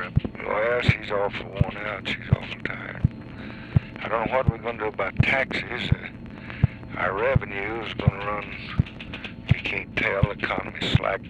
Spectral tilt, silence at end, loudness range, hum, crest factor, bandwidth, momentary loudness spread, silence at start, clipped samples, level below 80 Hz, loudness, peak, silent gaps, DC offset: -7.5 dB/octave; 0 s; 2 LU; none; 20 dB; 8.6 kHz; 9 LU; 0 s; under 0.1%; -40 dBFS; -26 LUFS; -6 dBFS; none; under 0.1%